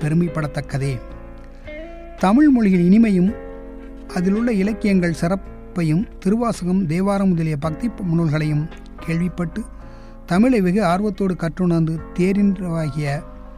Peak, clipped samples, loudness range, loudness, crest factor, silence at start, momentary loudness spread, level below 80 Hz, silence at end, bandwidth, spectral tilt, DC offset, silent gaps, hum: -4 dBFS; under 0.1%; 4 LU; -19 LUFS; 14 dB; 0 s; 19 LU; -36 dBFS; 0 s; 12 kHz; -8 dB/octave; under 0.1%; none; none